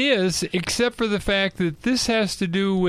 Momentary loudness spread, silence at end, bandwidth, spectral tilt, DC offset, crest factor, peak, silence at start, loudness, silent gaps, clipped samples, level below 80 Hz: 3 LU; 0 s; 14.5 kHz; -4 dB/octave; under 0.1%; 14 dB; -8 dBFS; 0 s; -22 LUFS; none; under 0.1%; -44 dBFS